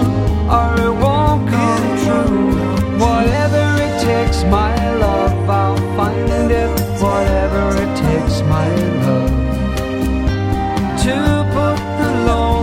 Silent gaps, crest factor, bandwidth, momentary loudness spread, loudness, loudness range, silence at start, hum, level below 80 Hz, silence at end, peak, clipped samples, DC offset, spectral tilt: none; 14 dB; 16 kHz; 3 LU; -15 LUFS; 2 LU; 0 s; none; -22 dBFS; 0 s; 0 dBFS; under 0.1%; under 0.1%; -7 dB/octave